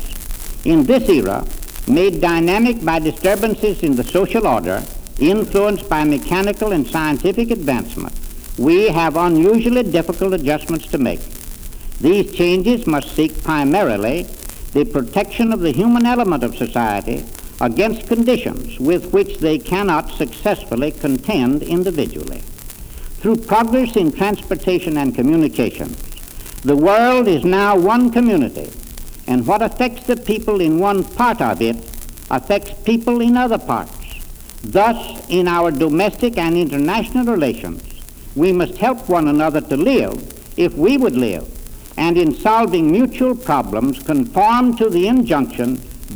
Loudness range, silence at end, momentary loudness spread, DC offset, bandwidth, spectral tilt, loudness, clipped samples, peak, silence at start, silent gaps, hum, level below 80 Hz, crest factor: 3 LU; 0 s; 16 LU; under 0.1%; over 20 kHz; -6 dB/octave; -16 LUFS; under 0.1%; -2 dBFS; 0 s; none; none; -32 dBFS; 14 dB